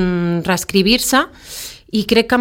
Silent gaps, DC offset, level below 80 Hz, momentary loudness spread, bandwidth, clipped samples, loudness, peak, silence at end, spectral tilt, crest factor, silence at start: none; under 0.1%; -40 dBFS; 16 LU; 17 kHz; under 0.1%; -16 LUFS; 0 dBFS; 0 s; -4 dB/octave; 16 dB; 0 s